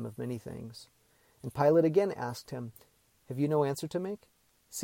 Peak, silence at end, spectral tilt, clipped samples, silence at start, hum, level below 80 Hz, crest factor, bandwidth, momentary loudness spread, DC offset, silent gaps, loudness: -12 dBFS; 0 s; -6.5 dB/octave; under 0.1%; 0 s; none; -68 dBFS; 20 dB; 17.5 kHz; 20 LU; under 0.1%; none; -31 LUFS